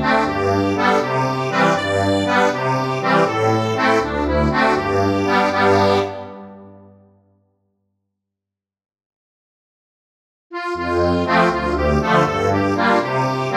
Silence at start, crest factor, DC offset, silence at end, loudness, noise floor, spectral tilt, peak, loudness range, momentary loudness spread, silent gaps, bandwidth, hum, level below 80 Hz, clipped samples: 0 s; 18 dB; under 0.1%; 0 s; -17 LUFS; -86 dBFS; -6 dB/octave; -2 dBFS; 9 LU; 4 LU; 9.06-10.50 s; 14 kHz; none; -38 dBFS; under 0.1%